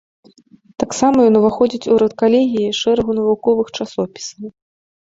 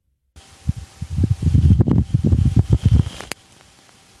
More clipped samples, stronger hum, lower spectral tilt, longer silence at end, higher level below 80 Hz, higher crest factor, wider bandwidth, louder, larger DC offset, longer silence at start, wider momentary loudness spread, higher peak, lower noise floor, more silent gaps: neither; neither; second, -5 dB/octave vs -8 dB/octave; second, 0.55 s vs 0.95 s; second, -50 dBFS vs -26 dBFS; about the same, 16 dB vs 18 dB; second, 8 kHz vs 12 kHz; about the same, -16 LUFS vs -18 LUFS; neither; first, 0.8 s vs 0.65 s; second, 13 LU vs 17 LU; about the same, -2 dBFS vs 0 dBFS; about the same, -48 dBFS vs -50 dBFS; neither